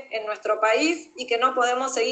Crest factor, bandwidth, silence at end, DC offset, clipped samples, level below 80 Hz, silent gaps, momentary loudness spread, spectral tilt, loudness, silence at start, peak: 16 dB; 9.2 kHz; 0 s; under 0.1%; under 0.1%; -76 dBFS; none; 9 LU; -0.5 dB/octave; -23 LUFS; 0 s; -8 dBFS